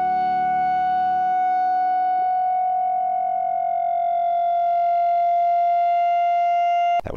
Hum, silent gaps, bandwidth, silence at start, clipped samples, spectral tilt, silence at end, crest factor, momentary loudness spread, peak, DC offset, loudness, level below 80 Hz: none; none; 4.7 kHz; 0 s; under 0.1%; -5.5 dB/octave; 0 s; 8 dB; 3 LU; -12 dBFS; under 0.1%; -20 LUFS; -54 dBFS